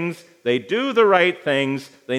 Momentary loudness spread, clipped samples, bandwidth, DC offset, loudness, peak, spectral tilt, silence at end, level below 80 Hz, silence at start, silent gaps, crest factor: 13 LU; under 0.1%; 13.5 kHz; under 0.1%; -19 LUFS; -2 dBFS; -5.5 dB/octave; 0 s; -82 dBFS; 0 s; none; 18 dB